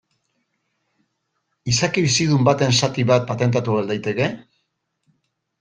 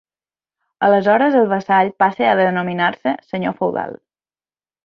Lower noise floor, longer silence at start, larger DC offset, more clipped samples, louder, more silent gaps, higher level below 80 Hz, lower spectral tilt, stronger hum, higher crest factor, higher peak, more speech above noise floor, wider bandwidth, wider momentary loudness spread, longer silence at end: second, -74 dBFS vs under -90 dBFS; first, 1.65 s vs 0.8 s; neither; neither; about the same, -19 LUFS vs -17 LUFS; neither; first, -54 dBFS vs -64 dBFS; second, -4.5 dB/octave vs -7.5 dB/octave; neither; about the same, 20 dB vs 16 dB; about the same, -2 dBFS vs -2 dBFS; second, 55 dB vs over 74 dB; first, 10 kHz vs 6.4 kHz; about the same, 7 LU vs 9 LU; first, 1.2 s vs 0.9 s